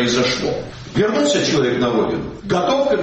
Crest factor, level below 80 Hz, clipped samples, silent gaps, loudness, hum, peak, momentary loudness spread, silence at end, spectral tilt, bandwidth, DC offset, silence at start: 12 dB; -44 dBFS; under 0.1%; none; -18 LUFS; none; -6 dBFS; 8 LU; 0 s; -4.5 dB/octave; 8.4 kHz; under 0.1%; 0 s